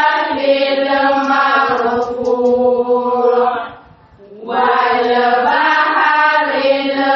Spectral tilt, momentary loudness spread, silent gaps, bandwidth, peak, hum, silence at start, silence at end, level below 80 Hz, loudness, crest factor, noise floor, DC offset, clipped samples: 0 dB/octave; 5 LU; none; 6.6 kHz; -2 dBFS; none; 0 s; 0 s; -56 dBFS; -13 LUFS; 12 dB; -42 dBFS; under 0.1%; under 0.1%